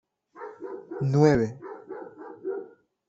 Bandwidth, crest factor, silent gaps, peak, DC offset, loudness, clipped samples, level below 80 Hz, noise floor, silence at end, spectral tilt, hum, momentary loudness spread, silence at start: 7.8 kHz; 22 dB; none; -6 dBFS; under 0.1%; -26 LUFS; under 0.1%; -58 dBFS; -46 dBFS; 0.4 s; -8 dB/octave; none; 22 LU; 0.35 s